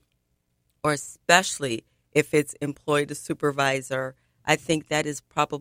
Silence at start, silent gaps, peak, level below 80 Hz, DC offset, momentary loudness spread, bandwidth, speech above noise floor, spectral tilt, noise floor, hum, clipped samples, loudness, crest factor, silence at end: 0.85 s; none; 0 dBFS; -62 dBFS; under 0.1%; 11 LU; 16.5 kHz; 48 dB; -3.5 dB/octave; -73 dBFS; none; under 0.1%; -25 LUFS; 26 dB; 0 s